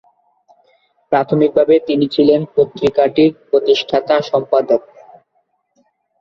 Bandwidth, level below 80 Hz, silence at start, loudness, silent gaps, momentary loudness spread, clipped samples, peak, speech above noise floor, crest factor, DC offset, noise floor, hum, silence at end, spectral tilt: 6.8 kHz; -56 dBFS; 1.1 s; -14 LUFS; none; 5 LU; under 0.1%; -2 dBFS; 51 dB; 14 dB; under 0.1%; -65 dBFS; none; 1.4 s; -7 dB/octave